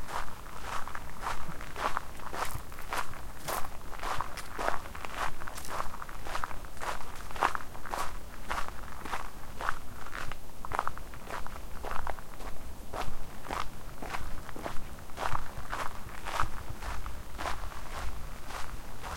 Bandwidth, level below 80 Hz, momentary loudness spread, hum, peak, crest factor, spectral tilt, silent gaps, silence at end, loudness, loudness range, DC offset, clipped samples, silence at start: 17 kHz; -42 dBFS; 9 LU; none; -10 dBFS; 22 dB; -3.5 dB/octave; none; 0 s; -39 LUFS; 3 LU; 2%; under 0.1%; 0 s